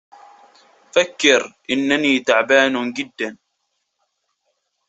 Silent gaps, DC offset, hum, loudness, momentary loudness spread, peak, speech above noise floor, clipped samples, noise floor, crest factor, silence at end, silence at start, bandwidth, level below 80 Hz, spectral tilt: none; under 0.1%; none; -17 LUFS; 11 LU; -2 dBFS; 55 dB; under 0.1%; -73 dBFS; 20 dB; 1.55 s; 0.95 s; 8.2 kHz; -66 dBFS; -2.5 dB/octave